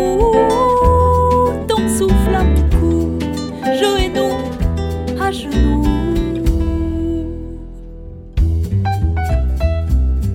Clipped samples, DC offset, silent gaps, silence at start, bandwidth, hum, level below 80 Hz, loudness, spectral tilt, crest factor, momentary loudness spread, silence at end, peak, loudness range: under 0.1%; under 0.1%; none; 0 s; 16 kHz; none; -20 dBFS; -16 LUFS; -6.5 dB/octave; 14 dB; 9 LU; 0 s; 0 dBFS; 6 LU